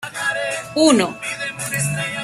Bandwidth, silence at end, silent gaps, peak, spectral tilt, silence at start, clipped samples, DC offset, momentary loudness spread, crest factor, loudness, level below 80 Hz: 15 kHz; 0 s; none; 0 dBFS; -3.5 dB/octave; 0 s; under 0.1%; under 0.1%; 10 LU; 20 dB; -19 LUFS; -58 dBFS